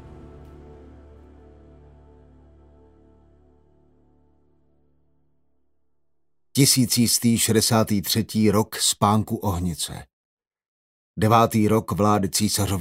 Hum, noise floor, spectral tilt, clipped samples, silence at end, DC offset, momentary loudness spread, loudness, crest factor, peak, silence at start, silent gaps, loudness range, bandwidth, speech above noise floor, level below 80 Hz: none; -80 dBFS; -4.5 dB/octave; under 0.1%; 0 s; under 0.1%; 9 LU; -20 LUFS; 22 dB; -2 dBFS; 0.05 s; 10.13-10.37 s, 10.68-11.14 s; 5 LU; 16 kHz; 60 dB; -50 dBFS